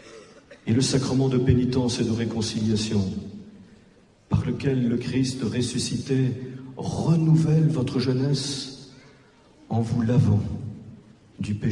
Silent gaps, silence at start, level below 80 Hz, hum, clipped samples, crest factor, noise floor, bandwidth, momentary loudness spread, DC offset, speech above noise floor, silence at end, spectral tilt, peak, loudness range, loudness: none; 0.05 s; -50 dBFS; none; under 0.1%; 18 dB; -55 dBFS; 11.5 kHz; 14 LU; under 0.1%; 33 dB; 0 s; -6.5 dB/octave; -6 dBFS; 3 LU; -24 LUFS